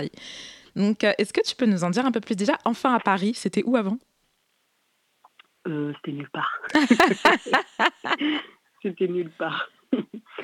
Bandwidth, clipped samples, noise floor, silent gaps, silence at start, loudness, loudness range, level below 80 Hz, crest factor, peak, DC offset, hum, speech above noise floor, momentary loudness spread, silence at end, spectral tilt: 17.5 kHz; under 0.1%; -70 dBFS; none; 0 s; -24 LUFS; 7 LU; -66 dBFS; 22 dB; -4 dBFS; under 0.1%; none; 46 dB; 15 LU; 0 s; -5 dB/octave